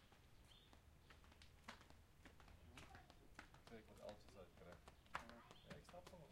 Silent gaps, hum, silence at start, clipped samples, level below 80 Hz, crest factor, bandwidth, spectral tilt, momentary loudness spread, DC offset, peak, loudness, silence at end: none; none; 0 s; under 0.1%; -72 dBFS; 34 dB; 16 kHz; -4.5 dB/octave; 12 LU; under 0.1%; -30 dBFS; -63 LUFS; 0 s